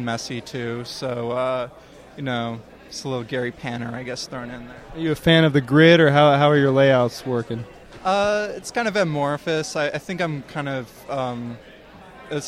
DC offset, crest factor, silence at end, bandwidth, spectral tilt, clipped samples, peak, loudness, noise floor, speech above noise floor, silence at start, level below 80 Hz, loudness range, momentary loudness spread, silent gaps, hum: under 0.1%; 20 dB; 0 s; 15 kHz; -5.5 dB/octave; under 0.1%; -2 dBFS; -21 LUFS; -44 dBFS; 23 dB; 0 s; -52 dBFS; 11 LU; 18 LU; none; none